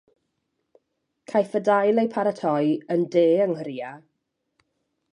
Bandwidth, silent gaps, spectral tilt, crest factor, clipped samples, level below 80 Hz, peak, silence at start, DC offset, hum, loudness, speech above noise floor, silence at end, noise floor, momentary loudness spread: 10.5 kHz; none; -7.5 dB/octave; 16 dB; under 0.1%; -78 dBFS; -8 dBFS; 1.3 s; under 0.1%; none; -23 LUFS; 55 dB; 1.15 s; -77 dBFS; 11 LU